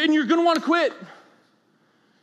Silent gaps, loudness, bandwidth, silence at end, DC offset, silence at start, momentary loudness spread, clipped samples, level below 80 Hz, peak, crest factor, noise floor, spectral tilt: none; -20 LUFS; 12 kHz; 1.15 s; under 0.1%; 0 s; 9 LU; under 0.1%; -86 dBFS; -8 dBFS; 16 dB; -63 dBFS; -4 dB/octave